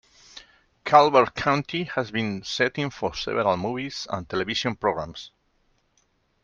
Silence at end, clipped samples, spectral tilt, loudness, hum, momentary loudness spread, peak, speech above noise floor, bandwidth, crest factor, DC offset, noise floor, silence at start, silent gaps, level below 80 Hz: 1.15 s; under 0.1%; -5 dB/octave; -24 LUFS; none; 15 LU; -2 dBFS; 44 dB; 7.4 kHz; 24 dB; under 0.1%; -68 dBFS; 0.35 s; none; -56 dBFS